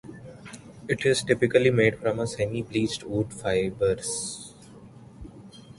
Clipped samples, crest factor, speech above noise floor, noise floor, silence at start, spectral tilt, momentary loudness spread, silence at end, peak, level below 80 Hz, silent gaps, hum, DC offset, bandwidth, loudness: under 0.1%; 20 dB; 23 dB; -48 dBFS; 0.05 s; -5 dB/octave; 23 LU; 0.2 s; -6 dBFS; -52 dBFS; none; none; under 0.1%; 11.5 kHz; -25 LUFS